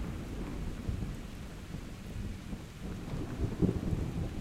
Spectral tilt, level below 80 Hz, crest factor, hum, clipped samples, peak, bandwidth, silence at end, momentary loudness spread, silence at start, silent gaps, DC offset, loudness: -7 dB/octave; -42 dBFS; 20 dB; none; under 0.1%; -16 dBFS; 16 kHz; 0 s; 12 LU; 0 s; none; under 0.1%; -39 LUFS